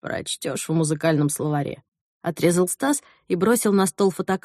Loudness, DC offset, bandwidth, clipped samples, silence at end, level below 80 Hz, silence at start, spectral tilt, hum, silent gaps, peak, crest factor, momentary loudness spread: -22 LUFS; under 0.1%; 13 kHz; under 0.1%; 0.05 s; -62 dBFS; 0.05 s; -5 dB/octave; none; 1.88-1.92 s, 2.01-2.21 s; -6 dBFS; 18 dB; 9 LU